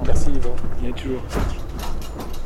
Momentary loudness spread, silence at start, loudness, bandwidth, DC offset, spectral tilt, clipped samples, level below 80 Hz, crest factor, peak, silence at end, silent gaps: 7 LU; 0 s; -28 LUFS; 10.5 kHz; under 0.1%; -6 dB/octave; under 0.1%; -22 dBFS; 14 dB; -4 dBFS; 0 s; none